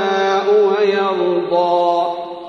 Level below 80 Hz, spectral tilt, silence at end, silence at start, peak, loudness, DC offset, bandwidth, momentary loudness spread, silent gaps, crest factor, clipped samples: -66 dBFS; -5.5 dB/octave; 0 s; 0 s; -4 dBFS; -16 LUFS; under 0.1%; 6.8 kHz; 4 LU; none; 12 dB; under 0.1%